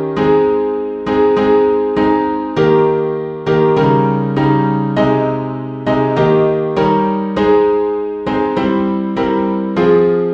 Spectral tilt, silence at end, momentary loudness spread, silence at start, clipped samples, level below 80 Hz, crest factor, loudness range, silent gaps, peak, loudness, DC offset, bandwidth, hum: -9 dB/octave; 0 s; 6 LU; 0 s; under 0.1%; -44 dBFS; 12 dB; 1 LU; none; 0 dBFS; -14 LUFS; under 0.1%; 6.4 kHz; none